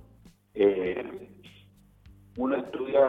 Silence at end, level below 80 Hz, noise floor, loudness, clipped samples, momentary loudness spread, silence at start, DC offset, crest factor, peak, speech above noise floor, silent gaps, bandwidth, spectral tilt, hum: 0 s; -60 dBFS; -57 dBFS; -28 LUFS; under 0.1%; 20 LU; 0.55 s; under 0.1%; 18 dB; -10 dBFS; 31 dB; none; 4.5 kHz; -7.5 dB/octave; none